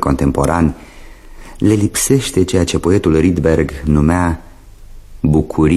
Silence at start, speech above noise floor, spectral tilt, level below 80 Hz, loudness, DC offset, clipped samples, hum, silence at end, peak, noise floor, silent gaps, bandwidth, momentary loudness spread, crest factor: 0 s; 23 dB; -6 dB/octave; -26 dBFS; -14 LUFS; under 0.1%; under 0.1%; none; 0 s; 0 dBFS; -36 dBFS; none; 14.5 kHz; 5 LU; 14 dB